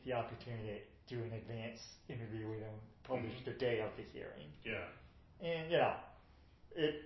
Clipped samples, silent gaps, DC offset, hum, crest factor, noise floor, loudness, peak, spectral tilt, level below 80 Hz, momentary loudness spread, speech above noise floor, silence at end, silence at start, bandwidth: under 0.1%; none; under 0.1%; none; 22 dB; -64 dBFS; -43 LUFS; -22 dBFS; -4.5 dB/octave; -66 dBFS; 15 LU; 22 dB; 0 s; 0 s; 6 kHz